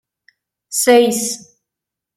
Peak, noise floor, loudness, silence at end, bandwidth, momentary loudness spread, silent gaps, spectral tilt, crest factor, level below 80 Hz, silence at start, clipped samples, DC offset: -2 dBFS; -83 dBFS; -15 LUFS; 0.8 s; 16 kHz; 12 LU; none; -2 dB/octave; 18 dB; -66 dBFS; 0.7 s; under 0.1%; under 0.1%